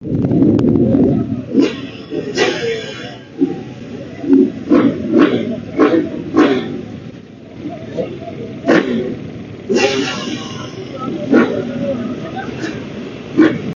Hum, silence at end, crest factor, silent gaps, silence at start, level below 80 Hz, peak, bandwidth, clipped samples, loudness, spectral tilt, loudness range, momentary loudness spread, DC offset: none; 0 s; 16 dB; none; 0 s; -46 dBFS; 0 dBFS; 7.4 kHz; under 0.1%; -16 LUFS; -6.5 dB/octave; 5 LU; 16 LU; under 0.1%